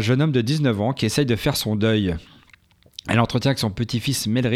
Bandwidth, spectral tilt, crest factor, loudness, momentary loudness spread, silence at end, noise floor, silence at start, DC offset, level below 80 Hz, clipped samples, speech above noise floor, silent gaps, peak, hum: 16 kHz; -5.5 dB/octave; 16 dB; -21 LUFS; 6 LU; 0 s; -54 dBFS; 0 s; under 0.1%; -46 dBFS; under 0.1%; 34 dB; none; -4 dBFS; none